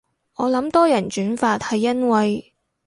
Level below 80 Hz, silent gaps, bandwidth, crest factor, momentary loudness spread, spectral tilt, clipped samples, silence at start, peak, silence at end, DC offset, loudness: -58 dBFS; none; 11.5 kHz; 16 dB; 8 LU; -5.5 dB/octave; under 0.1%; 0.4 s; -4 dBFS; 0.45 s; under 0.1%; -20 LUFS